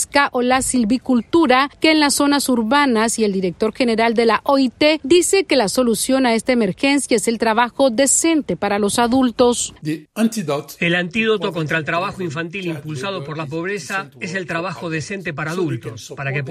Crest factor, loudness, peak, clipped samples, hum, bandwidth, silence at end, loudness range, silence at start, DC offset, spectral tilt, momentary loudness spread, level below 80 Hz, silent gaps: 16 dB; -18 LUFS; 0 dBFS; under 0.1%; none; 15 kHz; 0 s; 8 LU; 0 s; under 0.1%; -3.5 dB/octave; 11 LU; -50 dBFS; none